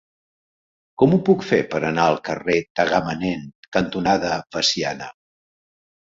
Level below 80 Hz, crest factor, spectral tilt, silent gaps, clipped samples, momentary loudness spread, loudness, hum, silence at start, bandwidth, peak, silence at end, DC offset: -52 dBFS; 20 dB; -5 dB/octave; 2.70-2.75 s, 3.55-3.72 s; under 0.1%; 8 LU; -20 LUFS; none; 1 s; 7.8 kHz; -2 dBFS; 0.9 s; under 0.1%